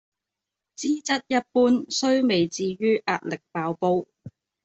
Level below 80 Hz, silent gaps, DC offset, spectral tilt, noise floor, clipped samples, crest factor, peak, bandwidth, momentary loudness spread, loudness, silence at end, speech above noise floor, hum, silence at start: -66 dBFS; none; under 0.1%; -4.5 dB/octave; -86 dBFS; under 0.1%; 16 dB; -8 dBFS; 8.2 kHz; 9 LU; -24 LUFS; 0.35 s; 63 dB; none; 0.8 s